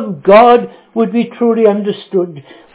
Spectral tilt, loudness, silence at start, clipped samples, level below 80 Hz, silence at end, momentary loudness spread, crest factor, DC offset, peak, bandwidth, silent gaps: -10.5 dB/octave; -11 LUFS; 0 s; 0.8%; -56 dBFS; 0.35 s; 12 LU; 12 dB; under 0.1%; 0 dBFS; 4 kHz; none